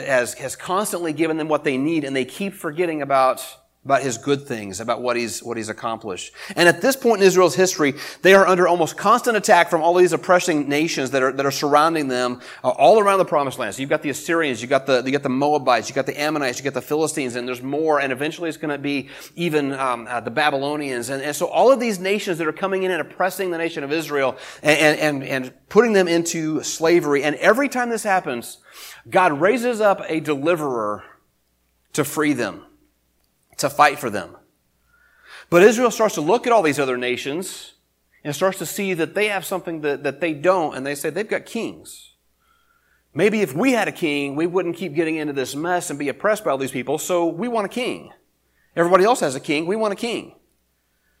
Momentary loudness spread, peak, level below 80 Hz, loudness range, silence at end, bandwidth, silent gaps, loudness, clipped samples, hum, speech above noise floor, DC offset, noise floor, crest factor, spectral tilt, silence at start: 12 LU; 0 dBFS; -64 dBFS; 7 LU; 0.9 s; 16 kHz; none; -20 LUFS; under 0.1%; none; 47 dB; under 0.1%; -67 dBFS; 20 dB; -4 dB/octave; 0 s